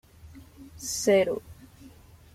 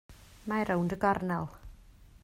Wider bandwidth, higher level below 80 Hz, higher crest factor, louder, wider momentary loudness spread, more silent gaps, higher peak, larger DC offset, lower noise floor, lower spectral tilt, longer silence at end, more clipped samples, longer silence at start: about the same, 16 kHz vs 16 kHz; about the same, -56 dBFS vs -54 dBFS; about the same, 20 dB vs 20 dB; first, -26 LUFS vs -31 LUFS; first, 26 LU vs 12 LU; neither; first, -10 dBFS vs -14 dBFS; neither; second, -51 dBFS vs -55 dBFS; second, -3.5 dB/octave vs -7.5 dB/octave; first, 0.45 s vs 0.05 s; neither; first, 0.25 s vs 0.1 s